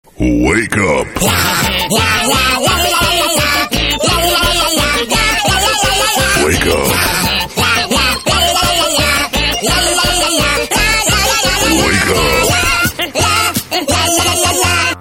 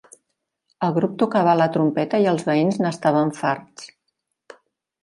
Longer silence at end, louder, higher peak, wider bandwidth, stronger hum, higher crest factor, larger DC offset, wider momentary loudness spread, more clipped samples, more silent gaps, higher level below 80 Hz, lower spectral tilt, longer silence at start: second, 0 s vs 1.15 s; first, -11 LUFS vs -20 LUFS; first, 0 dBFS vs -4 dBFS; first, 17 kHz vs 11.5 kHz; neither; second, 12 dB vs 18 dB; first, 0.1% vs under 0.1%; second, 3 LU vs 8 LU; neither; neither; first, -26 dBFS vs -70 dBFS; second, -2.5 dB/octave vs -7 dB/octave; second, 0.2 s vs 0.8 s